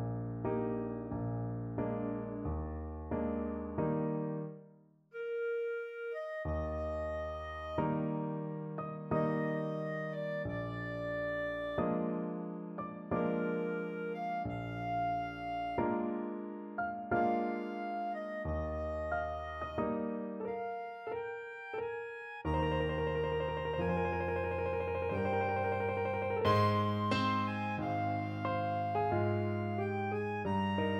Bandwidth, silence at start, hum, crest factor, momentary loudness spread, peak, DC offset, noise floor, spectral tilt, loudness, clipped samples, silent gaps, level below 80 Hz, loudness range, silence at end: 14 kHz; 0 s; none; 18 dB; 8 LU; -18 dBFS; under 0.1%; -62 dBFS; -8.5 dB/octave; -36 LUFS; under 0.1%; none; -52 dBFS; 5 LU; 0 s